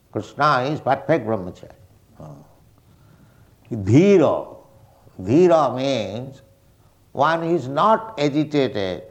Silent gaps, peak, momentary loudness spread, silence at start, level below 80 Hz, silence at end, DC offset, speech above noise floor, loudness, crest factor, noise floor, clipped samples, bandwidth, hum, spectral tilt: none; -2 dBFS; 18 LU; 0.15 s; -58 dBFS; 0.05 s; under 0.1%; 36 dB; -19 LUFS; 18 dB; -55 dBFS; under 0.1%; 8.8 kHz; none; -7 dB/octave